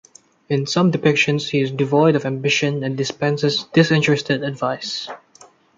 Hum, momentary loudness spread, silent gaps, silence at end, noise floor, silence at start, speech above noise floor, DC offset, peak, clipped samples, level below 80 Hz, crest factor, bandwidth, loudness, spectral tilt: none; 9 LU; none; 0.6 s; -49 dBFS; 0.5 s; 31 dB; under 0.1%; -2 dBFS; under 0.1%; -62 dBFS; 18 dB; 7.8 kHz; -19 LUFS; -5.5 dB/octave